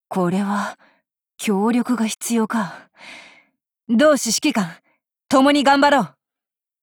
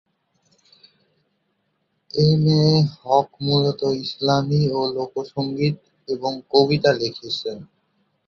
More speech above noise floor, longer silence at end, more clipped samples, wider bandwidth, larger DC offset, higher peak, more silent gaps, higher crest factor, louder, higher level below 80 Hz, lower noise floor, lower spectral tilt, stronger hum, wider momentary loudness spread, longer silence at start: first, 70 dB vs 51 dB; about the same, 0.75 s vs 0.65 s; neither; first, 19.5 kHz vs 7 kHz; neither; about the same, -4 dBFS vs -2 dBFS; neither; about the same, 16 dB vs 20 dB; about the same, -18 LUFS vs -20 LUFS; second, -64 dBFS vs -56 dBFS; first, -89 dBFS vs -71 dBFS; second, -4 dB/octave vs -7 dB/octave; neither; first, 16 LU vs 11 LU; second, 0.1 s vs 2.15 s